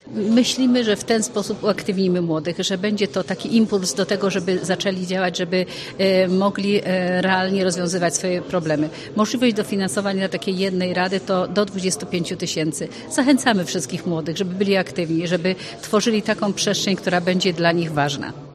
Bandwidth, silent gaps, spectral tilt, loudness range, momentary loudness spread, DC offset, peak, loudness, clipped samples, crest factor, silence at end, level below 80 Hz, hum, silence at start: 13 kHz; none; -4.5 dB/octave; 2 LU; 6 LU; under 0.1%; -2 dBFS; -21 LUFS; under 0.1%; 20 dB; 0 s; -58 dBFS; none; 0.05 s